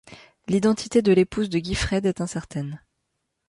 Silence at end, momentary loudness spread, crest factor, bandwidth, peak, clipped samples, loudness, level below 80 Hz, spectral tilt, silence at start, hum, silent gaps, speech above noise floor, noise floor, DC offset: 0.7 s; 14 LU; 16 dB; 11.5 kHz; -8 dBFS; under 0.1%; -23 LUFS; -42 dBFS; -6 dB/octave; 0.1 s; none; none; 55 dB; -77 dBFS; under 0.1%